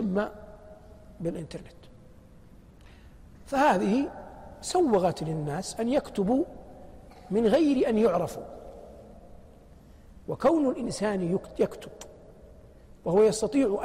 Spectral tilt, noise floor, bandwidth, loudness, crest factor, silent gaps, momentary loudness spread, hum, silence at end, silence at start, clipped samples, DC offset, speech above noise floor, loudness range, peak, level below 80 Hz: -6 dB/octave; -52 dBFS; 15.5 kHz; -27 LUFS; 18 dB; none; 23 LU; none; 0 s; 0 s; under 0.1%; under 0.1%; 26 dB; 4 LU; -12 dBFS; -52 dBFS